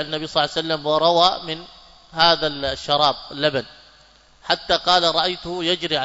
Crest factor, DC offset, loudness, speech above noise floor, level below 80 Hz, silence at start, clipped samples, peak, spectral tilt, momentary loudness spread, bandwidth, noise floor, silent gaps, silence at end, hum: 20 dB; under 0.1%; -19 LUFS; 32 dB; -50 dBFS; 0 s; under 0.1%; -2 dBFS; -3.5 dB/octave; 12 LU; 8 kHz; -52 dBFS; none; 0 s; none